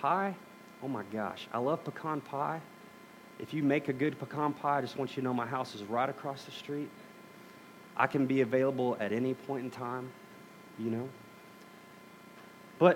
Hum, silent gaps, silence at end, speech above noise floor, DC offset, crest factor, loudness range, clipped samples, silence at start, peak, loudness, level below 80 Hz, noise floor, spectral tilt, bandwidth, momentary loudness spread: 60 Hz at -65 dBFS; none; 0 s; 20 dB; under 0.1%; 24 dB; 5 LU; under 0.1%; 0 s; -10 dBFS; -34 LUFS; -82 dBFS; -54 dBFS; -7 dB/octave; 17 kHz; 23 LU